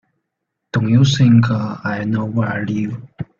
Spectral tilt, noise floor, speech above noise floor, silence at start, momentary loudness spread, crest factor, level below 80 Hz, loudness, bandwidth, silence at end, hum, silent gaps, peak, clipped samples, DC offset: -6.5 dB/octave; -77 dBFS; 61 dB; 0.75 s; 11 LU; 16 dB; -50 dBFS; -17 LUFS; 7.2 kHz; 0.15 s; none; none; -2 dBFS; under 0.1%; under 0.1%